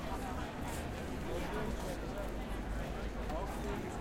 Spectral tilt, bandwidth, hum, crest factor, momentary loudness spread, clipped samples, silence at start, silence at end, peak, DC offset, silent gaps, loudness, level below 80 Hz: -5.5 dB/octave; 16.5 kHz; none; 12 dB; 2 LU; under 0.1%; 0 s; 0 s; -26 dBFS; under 0.1%; none; -41 LUFS; -44 dBFS